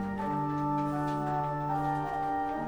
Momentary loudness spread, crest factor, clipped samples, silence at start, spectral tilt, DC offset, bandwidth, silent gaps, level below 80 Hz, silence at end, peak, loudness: 1 LU; 12 dB; under 0.1%; 0 s; -8 dB/octave; under 0.1%; over 20 kHz; none; -54 dBFS; 0 s; -20 dBFS; -32 LUFS